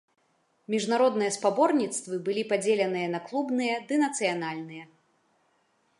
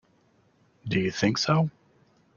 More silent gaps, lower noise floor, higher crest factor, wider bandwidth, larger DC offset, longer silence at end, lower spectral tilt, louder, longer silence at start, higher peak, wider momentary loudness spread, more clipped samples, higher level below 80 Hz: neither; first, -70 dBFS vs -64 dBFS; about the same, 18 dB vs 20 dB; first, 11.5 kHz vs 7.2 kHz; neither; first, 1.15 s vs 0.65 s; second, -4 dB/octave vs -5.5 dB/octave; about the same, -27 LUFS vs -26 LUFS; second, 0.7 s vs 0.85 s; about the same, -10 dBFS vs -8 dBFS; about the same, 8 LU vs 8 LU; neither; second, -82 dBFS vs -60 dBFS